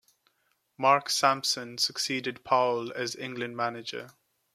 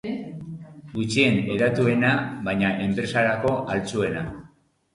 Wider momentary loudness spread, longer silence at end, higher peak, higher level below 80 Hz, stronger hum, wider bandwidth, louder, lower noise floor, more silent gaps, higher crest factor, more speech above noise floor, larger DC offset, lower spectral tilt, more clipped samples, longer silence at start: second, 11 LU vs 16 LU; about the same, 0.45 s vs 0.45 s; second, -8 dBFS vs -4 dBFS; second, -78 dBFS vs -52 dBFS; neither; first, 15.5 kHz vs 11.5 kHz; second, -28 LUFS vs -23 LUFS; first, -74 dBFS vs -55 dBFS; neither; about the same, 22 dB vs 20 dB; first, 45 dB vs 33 dB; neither; second, -2.5 dB/octave vs -6 dB/octave; neither; first, 0.8 s vs 0.05 s